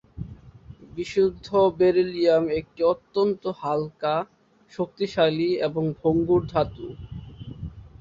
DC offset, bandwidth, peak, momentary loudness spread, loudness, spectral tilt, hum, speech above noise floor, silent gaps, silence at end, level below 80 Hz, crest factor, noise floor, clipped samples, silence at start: under 0.1%; 7.6 kHz; -8 dBFS; 19 LU; -24 LUFS; -7.5 dB/octave; none; 23 dB; none; 0.15 s; -50 dBFS; 18 dB; -46 dBFS; under 0.1%; 0.15 s